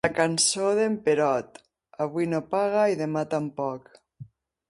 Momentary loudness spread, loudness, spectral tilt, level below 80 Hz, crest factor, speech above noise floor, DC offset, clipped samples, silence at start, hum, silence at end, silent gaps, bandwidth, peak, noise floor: 11 LU; -25 LUFS; -3.5 dB/octave; -64 dBFS; 18 dB; 23 dB; under 0.1%; under 0.1%; 0.05 s; none; 0.45 s; none; 11.5 kHz; -8 dBFS; -48 dBFS